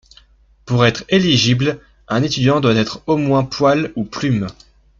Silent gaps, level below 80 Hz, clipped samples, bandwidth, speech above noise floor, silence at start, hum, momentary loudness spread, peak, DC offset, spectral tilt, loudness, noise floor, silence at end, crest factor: none; -46 dBFS; under 0.1%; 7.6 kHz; 34 dB; 0.65 s; none; 8 LU; -2 dBFS; under 0.1%; -5.5 dB/octave; -16 LUFS; -50 dBFS; 0.45 s; 16 dB